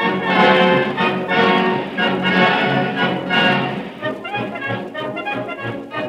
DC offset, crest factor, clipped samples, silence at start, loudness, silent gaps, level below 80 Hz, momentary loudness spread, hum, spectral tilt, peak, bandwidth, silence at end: under 0.1%; 16 dB; under 0.1%; 0 s; -17 LUFS; none; -58 dBFS; 12 LU; none; -6.5 dB/octave; -2 dBFS; 10 kHz; 0 s